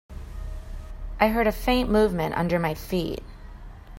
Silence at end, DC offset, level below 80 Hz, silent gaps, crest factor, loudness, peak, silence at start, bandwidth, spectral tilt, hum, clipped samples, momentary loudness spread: 0 s; under 0.1%; -36 dBFS; none; 22 dB; -24 LUFS; -4 dBFS; 0.1 s; 16.5 kHz; -6.5 dB/octave; none; under 0.1%; 22 LU